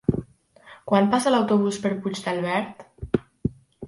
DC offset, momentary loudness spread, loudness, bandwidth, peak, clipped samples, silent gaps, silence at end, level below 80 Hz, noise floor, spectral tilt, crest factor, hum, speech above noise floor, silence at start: under 0.1%; 13 LU; -24 LUFS; 11.5 kHz; -6 dBFS; under 0.1%; none; 0 s; -48 dBFS; -51 dBFS; -6 dB/octave; 20 dB; none; 29 dB; 0.1 s